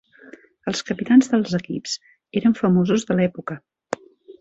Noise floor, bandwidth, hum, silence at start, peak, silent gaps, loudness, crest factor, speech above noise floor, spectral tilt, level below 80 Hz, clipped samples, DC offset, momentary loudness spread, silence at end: -47 dBFS; 8 kHz; none; 0.65 s; -4 dBFS; none; -21 LUFS; 18 dB; 27 dB; -6 dB/octave; -60 dBFS; under 0.1%; under 0.1%; 16 LU; 0.1 s